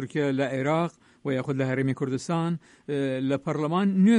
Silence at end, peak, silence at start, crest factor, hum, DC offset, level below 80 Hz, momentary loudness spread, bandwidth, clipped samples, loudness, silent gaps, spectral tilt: 0 s; -10 dBFS; 0 s; 16 dB; none; under 0.1%; -68 dBFS; 7 LU; 10.5 kHz; under 0.1%; -27 LUFS; none; -7 dB/octave